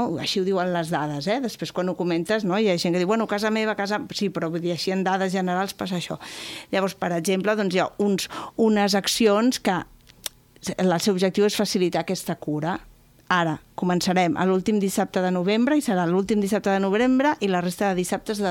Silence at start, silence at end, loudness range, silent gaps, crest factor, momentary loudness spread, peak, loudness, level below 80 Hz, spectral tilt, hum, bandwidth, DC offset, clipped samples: 0 s; 0 s; 3 LU; none; 16 dB; 8 LU; -6 dBFS; -23 LUFS; -58 dBFS; -5 dB/octave; none; 17.5 kHz; under 0.1%; under 0.1%